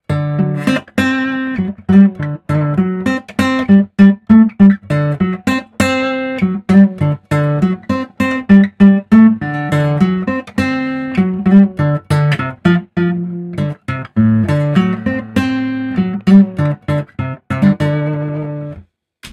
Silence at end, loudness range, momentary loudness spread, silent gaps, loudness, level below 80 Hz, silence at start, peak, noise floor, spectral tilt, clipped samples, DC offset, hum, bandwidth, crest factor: 0.05 s; 4 LU; 10 LU; none; -14 LUFS; -42 dBFS; 0.1 s; 0 dBFS; -40 dBFS; -8 dB/octave; 0.3%; under 0.1%; none; 11.5 kHz; 12 dB